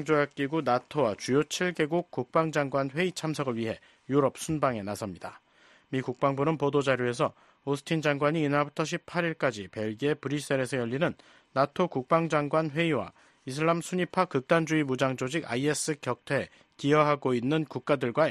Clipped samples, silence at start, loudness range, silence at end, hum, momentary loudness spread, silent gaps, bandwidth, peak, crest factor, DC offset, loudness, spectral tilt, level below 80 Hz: under 0.1%; 0 s; 3 LU; 0 s; none; 8 LU; none; 13 kHz; -8 dBFS; 20 dB; under 0.1%; -29 LUFS; -5.5 dB/octave; -66 dBFS